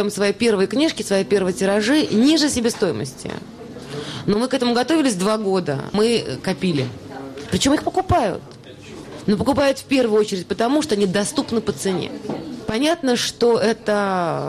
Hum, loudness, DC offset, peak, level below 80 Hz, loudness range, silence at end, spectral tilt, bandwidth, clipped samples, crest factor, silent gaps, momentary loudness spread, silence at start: none; -20 LUFS; under 0.1%; -6 dBFS; -48 dBFS; 2 LU; 0 s; -4.5 dB/octave; 14 kHz; under 0.1%; 14 dB; none; 14 LU; 0 s